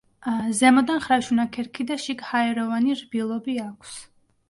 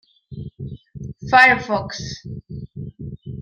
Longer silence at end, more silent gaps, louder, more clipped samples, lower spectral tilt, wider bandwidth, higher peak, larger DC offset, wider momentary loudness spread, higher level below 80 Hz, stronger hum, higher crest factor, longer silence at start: first, 0.45 s vs 0 s; neither; second, -23 LUFS vs -16 LUFS; neither; about the same, -3.5 dB/octave vs -4.5 dB/octave; about the same, 11.5 kHz vs 11.5 kHz; second, -6 dBFS vs -2 dBFS; neither; second, 14 LU vs 24 LU; second, -62 dBFS vs -48 dBFS; neither; about the same, 18 dB vs 20 dB; about the same, 0.25 s vs 0.3 s